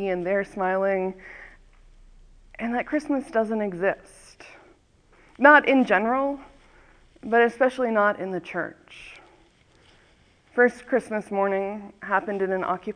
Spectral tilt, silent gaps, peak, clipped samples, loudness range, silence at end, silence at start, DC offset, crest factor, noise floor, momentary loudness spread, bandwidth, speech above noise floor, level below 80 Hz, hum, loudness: -6 dB/octave; none; -2 dBFS; under 0.1%; 8 LU; 0.05 s; 0 s; under 0.1%; 24 dB; -59 dBFS; 17 LU; 10.5 kHz; 35 dB; -58 dBFS; none; -23 LUFS